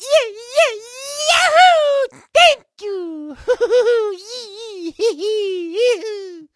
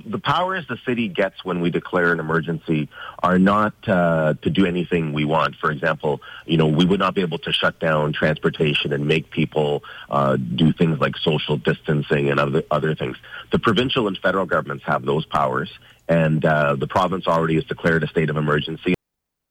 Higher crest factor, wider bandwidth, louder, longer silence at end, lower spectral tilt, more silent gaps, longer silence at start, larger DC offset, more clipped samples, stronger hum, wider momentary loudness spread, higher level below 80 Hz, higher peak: about the same, 16 dB vs 14 dB; first, 11 kHz vs 9.8 kHz; first, -15 LUFS vs -20 LUFS; second, 0.1 s vs 0.55 s; second, -0.5 dB/octave vs -7 dB/octave; neither; about the same, 0 s vs 0.05 s; neither; neither; neither; first, 18 LU vs 6 LU; second, -56 dBFS vs -48 dBFS; first, 0 dBFS vs -8 dBFS